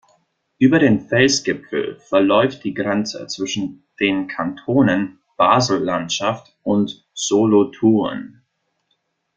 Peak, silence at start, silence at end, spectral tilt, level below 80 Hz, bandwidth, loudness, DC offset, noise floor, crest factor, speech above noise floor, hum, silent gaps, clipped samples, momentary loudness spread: -2 dBFS; 0.6 s; 1.1 s; -4.5 dB/octave; -56 dBFS; 9.2 kHz; -18 LUFS; under 0.1%; -70 dBFS; 18 dB; 53 dB; none; none; under 0.1%; 10 LU